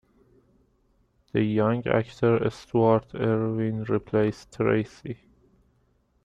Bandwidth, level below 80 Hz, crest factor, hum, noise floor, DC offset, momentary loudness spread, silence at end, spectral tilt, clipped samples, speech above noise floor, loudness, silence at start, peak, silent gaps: 9.2 kHz; -56 dBFS; 18 dB; none; -67 dBFS; under 0.1%; 8 LU; 1.1 s; -8.5 dB/octave; under 0.1%; 42 dB; -25 LUFS; 1.35 s; -8 dBFS; none